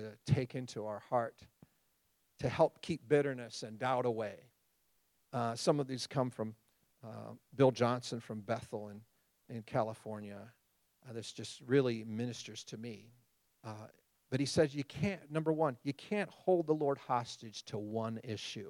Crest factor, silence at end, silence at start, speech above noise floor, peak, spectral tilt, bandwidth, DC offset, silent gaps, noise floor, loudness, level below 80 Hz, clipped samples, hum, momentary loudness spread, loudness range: 22 dB; 0 s; 0 s; 41 dB; -16 dBFS; -6 dB/octave; 16.5 kHz; under 0.1%; none; -77 dBFS; -37 LUFS; -72 dBFS; under 0.1%; none; 17 LU; 4 LU